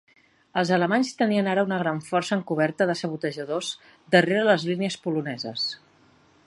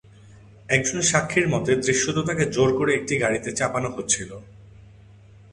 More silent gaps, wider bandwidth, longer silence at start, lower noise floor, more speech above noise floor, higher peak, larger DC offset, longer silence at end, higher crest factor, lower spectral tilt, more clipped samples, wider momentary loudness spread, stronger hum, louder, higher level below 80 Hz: neither; about the same, 11.5 kHz vs 11.5 kHz; first, 0.55 s vs 0.35 s; first, -58 dBFS vs -48 dBFS; first, 34 dB vs 26 dB; about the same, -2 dBFS vs -4 dBFS; neither; about the same, 0.7 s vs 0.7 s; about the same, 22 dB vs 20 dB; first, -5.5 dB/octave vs -4 dB/octave; neither; first, 9 LU vs 5 LU; neither; about the same, -24 LUFS vs -22 LUFS; second, -72 dBFS vs -52 dBFS